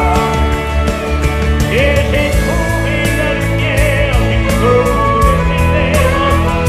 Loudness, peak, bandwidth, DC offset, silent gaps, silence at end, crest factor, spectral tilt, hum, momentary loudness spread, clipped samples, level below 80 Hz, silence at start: -13 LUFS; 0 dBFS; 15.5 kHz; under 0.1%; none; 0 s; 12 dB; -5.5 dB/octave; none; 4 LU; under 0.1%; -18 dBFS; 0 s